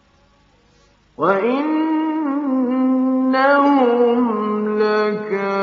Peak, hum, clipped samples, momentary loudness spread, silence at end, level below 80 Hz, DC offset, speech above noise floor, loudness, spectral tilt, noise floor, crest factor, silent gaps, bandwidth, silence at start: -2 dBFS; none; under 0.1%; 7 LU; 0 s; -66 dBFS; under 0.1%; 39 dB; -17 LUFS; -4.5 dB/octave; -55 dBFS; 16 dB; none; 6.2 kHz; 1.2 s